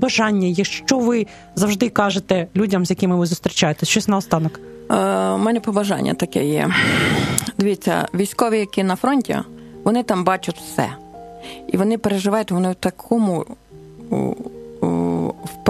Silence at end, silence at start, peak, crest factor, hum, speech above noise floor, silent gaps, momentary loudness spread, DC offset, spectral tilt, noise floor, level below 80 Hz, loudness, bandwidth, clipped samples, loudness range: 0 s; 0 s; 0 dBFS; 20 dB; none; 21 dB; none; 9 LU; under 0.1%; -5 dB/octave; -40 dBFS; -50 dBFS; -19 LUFS; 14 kHz; under 0.1%; 3 LU